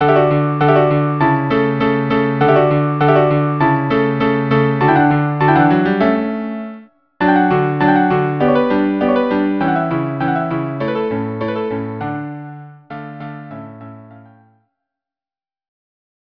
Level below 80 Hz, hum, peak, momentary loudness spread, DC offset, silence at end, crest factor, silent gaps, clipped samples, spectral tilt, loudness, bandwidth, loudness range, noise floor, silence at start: -48 dBFS; none; 0 dBFS; 17 LU; under 0.1%; 2.25 s; 16 dB; none; under 0.1%; -10 dB/octave; -15 LUFS; 5.4 kHz; 15 LU; under -90 dBFS; 0 s